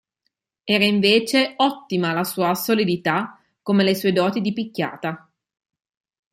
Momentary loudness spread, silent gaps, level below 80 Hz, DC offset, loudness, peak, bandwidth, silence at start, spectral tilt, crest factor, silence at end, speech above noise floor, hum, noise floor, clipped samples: 13 LU; none; -66 dBFS; under 0.1%; -20 LUFS; -2 dBFS; 15.5 kHz; 0.65 s; -5 dB/octave; 18 dB; 1.15 s; 56 dB; none; -76 dBFS; under 0.1%